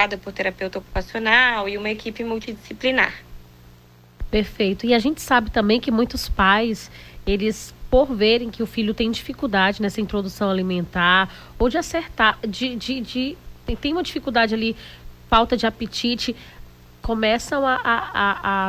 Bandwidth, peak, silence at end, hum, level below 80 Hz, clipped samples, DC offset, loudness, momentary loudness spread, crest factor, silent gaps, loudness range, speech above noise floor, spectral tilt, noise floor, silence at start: 16 kHz; -2 dBFS; 0 s; 60 Hz at -45 dBFS; -38 dBFS; under 0.1%; under 0.1%; -21 LUFS; 11 LU; 18 dB; none; 3 LU; 28 dB; -4.5 dB/octave; -49 dBFS; 0 s